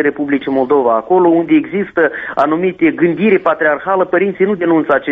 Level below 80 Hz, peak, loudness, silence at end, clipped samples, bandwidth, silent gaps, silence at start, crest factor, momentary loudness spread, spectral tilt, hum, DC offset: -54 dBFS; 0 dBFS; -13 LUFS; 0 s; under 0.1%; 4.6 kHz; none; 0 s; 12 dB; 4 LU; -9 dB/octave; none; under 0.1%